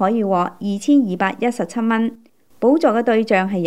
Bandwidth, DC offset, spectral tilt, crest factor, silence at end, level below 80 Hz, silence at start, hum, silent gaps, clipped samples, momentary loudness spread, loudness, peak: 12 kHz; 0.4%; -6.5 dB/octave; 16 dB; 0 s; -70 dBFS; 0 s; none; none; under 0.1%; 6 LU; -18 LUFS; -2 dBFS